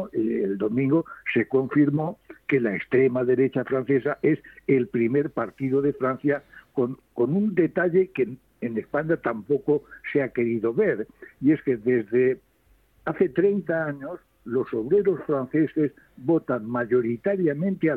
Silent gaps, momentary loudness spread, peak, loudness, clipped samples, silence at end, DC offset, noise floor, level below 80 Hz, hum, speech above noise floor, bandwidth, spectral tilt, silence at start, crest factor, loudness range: none; 8 LU; -8 dBFS; -24 LUFS; under 0.1%; 0 s; under 0.1%; -61 dBFS; -62 dBFS; none; 38 dB; 4.1 kHz; -10 dB/octave; 0 s; 16 dB; 2 LU